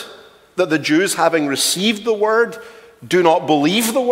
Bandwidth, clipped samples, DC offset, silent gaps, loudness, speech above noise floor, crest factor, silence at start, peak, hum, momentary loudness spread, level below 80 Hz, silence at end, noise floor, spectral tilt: 16.5 kHz; under 0.1%; under 0.1%; none; -16 LUFS; 26 dB; 16 dB; 0 s; 0 dBFS; none; 7 LU; -64 dBFS; 0 s; -42 dBFS; -3.5 dB/octave